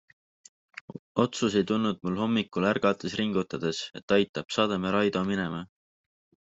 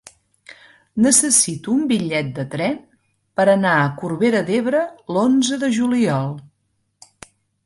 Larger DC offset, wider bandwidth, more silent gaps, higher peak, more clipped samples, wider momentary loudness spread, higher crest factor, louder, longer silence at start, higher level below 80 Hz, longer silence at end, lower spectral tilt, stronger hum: neither; second, 8 kHz vs 11.5 kHz; first, 0.99-1.15 s, 4.03-4.08 s, 4.29-4.34 s vs none; second, -10 dBFS vs -2 dBFS; neither; about the same, 13 LU vs 11 LU; about the same, 20 dB vs 18 dB; second, -28 LUFS vs -18 LUFS; first, 0.95 s vs 0.5 s; second, -66 dBFS vs -60 dBFS; second, 0.8 s vs 1.25 s; first, -5.5 dB/octave vs -4 dB/octave; neither